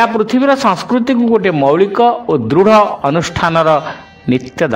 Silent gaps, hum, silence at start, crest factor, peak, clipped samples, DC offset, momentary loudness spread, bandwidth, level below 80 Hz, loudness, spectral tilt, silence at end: none; none; 0 s; 12 dB; 0 dBFS; under 0.1%; under 0.1%; 7 LU; 12 kHz; -46 dBFS; -12 LUFS; -6 dB/octave; 0 s